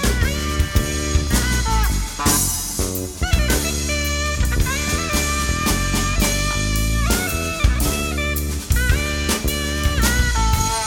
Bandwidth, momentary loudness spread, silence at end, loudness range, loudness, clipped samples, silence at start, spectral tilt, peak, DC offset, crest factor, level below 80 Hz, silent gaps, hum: 18 kHz; 4 LU; 0 s; 1 LU; -20 LUFS; under 0.1%; 0 s; -3.5 dB/octave; -2 dBFS; under 0.1%; 16 dB; -22 dBFS; none; none